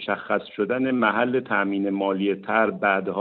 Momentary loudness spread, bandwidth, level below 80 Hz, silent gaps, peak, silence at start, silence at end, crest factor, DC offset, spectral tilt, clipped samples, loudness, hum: 4 LU; 4.5 kHz; -68 dBFS; none; -6 dBFS; 0 s; 0 s; 16 dB; under 0.1%; -4 dB/octave; under 0.1%; -23 LUFS; none